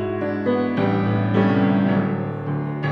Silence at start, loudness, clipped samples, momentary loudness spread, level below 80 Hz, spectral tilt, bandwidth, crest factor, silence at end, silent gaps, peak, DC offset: 0 s; -21 LUFS; under 0.1%; 8 LU; -52 dBFS; -10 dB/octave; 5.6 kHz; 14 dB; 0 s; none; -6 dBFS; under 0.1%